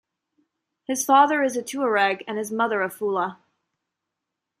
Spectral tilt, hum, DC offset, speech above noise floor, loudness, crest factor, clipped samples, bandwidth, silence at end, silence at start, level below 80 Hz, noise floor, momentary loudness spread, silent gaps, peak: -3 dB/octave; none; under 0.1%; 61 dB; -22 LUFS; 20 dB; under 0.1%; 15.5 kHz; 1.25 s; 0.9 s; -78 dBFS; -84 dBFS; 12 LU; none; -4 dBFS